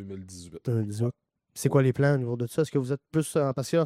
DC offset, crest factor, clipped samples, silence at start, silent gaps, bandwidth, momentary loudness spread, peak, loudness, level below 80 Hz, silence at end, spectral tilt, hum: under 0.1%; 18 dB; under 0.1%; 0 s; none; 15 kHz; 16 LU; -8 dBFS; -27 LUFS; -64 dBFS; 0 s; -7 dB/octave; none